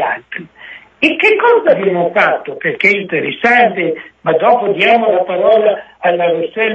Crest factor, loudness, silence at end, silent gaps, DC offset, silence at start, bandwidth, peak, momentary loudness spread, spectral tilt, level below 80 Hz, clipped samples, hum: 12 dB; -12 LUFS; 0 s; none; under 0.1%; 0 s; 8.4 kHz; 0 dBFS; 9 LU; -6 dB/octave; -60 dBFS; under 0.1%; none